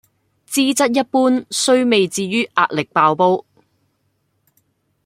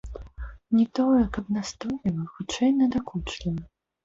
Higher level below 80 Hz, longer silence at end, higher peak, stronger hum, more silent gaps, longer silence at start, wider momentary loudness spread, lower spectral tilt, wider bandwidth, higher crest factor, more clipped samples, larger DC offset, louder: second, -66 dBFS vs -44 dBFS; first, 1.65 s vs 0.35 s; first, -2 dBFS vs -12 dBFS; neither; neither; first, 0.5 s vs 0.05 s; second, 5 LU vs 16 LU; second, -3.5 dB/octave vs -6 dB/octave; first, 16 kHz vs 7.8 kHz; about the same, 16 dB vs 14 dB; neither; neither; first, -16 LUFS vs -26 LUFS